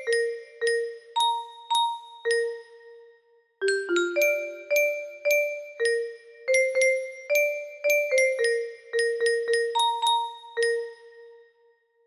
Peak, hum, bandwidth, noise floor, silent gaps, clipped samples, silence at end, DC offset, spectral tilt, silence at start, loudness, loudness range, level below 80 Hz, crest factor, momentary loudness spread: -10 dBFS; none; 13.5 kHz; -64 dBFS; none; under 0.1%; 0.7 s; under 0.1%; 0.5 dB/octave; 0 s; -25 LUFS; 3 LU; -76 dBFS; 16 dB; 8 LU